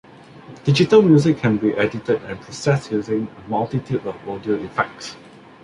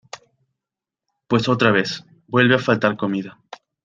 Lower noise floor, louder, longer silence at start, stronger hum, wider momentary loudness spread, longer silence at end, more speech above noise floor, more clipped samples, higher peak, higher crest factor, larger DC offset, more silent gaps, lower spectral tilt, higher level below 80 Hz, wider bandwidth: second, -42 dBFS vs -87 dBFS; about the same, -20 LUFS vs -19 LUFS; first, 0.35 s vs 0.15 s; neither; about the same, 13 LU vs 12 LU; about the same, 0.45 s vs 0.55 s; second, 23 dB vs 69 dB; neither; about the same, -2 dBFS vs 0 dBFS; about the same, 18 dB vs 20 dB; neither; neither; about the same, -7 dB/octave vs -6 dB/octave; first, -54 dBFS vs -60 dBFS; first, 11 kHz vs 7.8 kHz